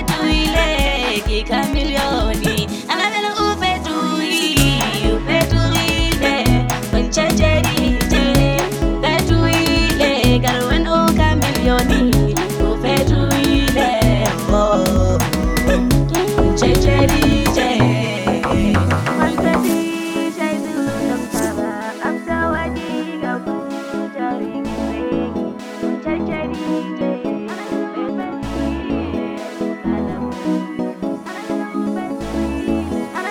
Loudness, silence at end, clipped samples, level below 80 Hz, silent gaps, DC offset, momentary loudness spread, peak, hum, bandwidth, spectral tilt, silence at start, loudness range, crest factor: -17 LUFS; 0 s; under 0.1%; -26 dBFS; none; under 0.1%; 9 LU; 0 dBFS; none; over 20 kHz; -5 dB/octave; 0 s; 8 LU; 16 dB